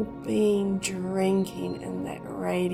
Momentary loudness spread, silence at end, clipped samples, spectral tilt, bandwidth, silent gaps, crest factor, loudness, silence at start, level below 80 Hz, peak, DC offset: 9 LU; 0 s; under 0.1%; -6 dB/octave; 15 kHz; none; 14 dB; -28 LUFS; 0 s; -56 dBFS; -14 dBFS; under 0.1%